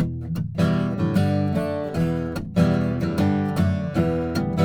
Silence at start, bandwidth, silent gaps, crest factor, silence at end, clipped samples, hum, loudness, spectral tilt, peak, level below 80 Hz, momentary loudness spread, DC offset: 0 s; 17 kHz; none; 16 dB; 0 s; under 0.1%; none; -23 LUFS; -8 dB/octave; -6 dBFS; -46 dBFS; 5 LU; under 0.1%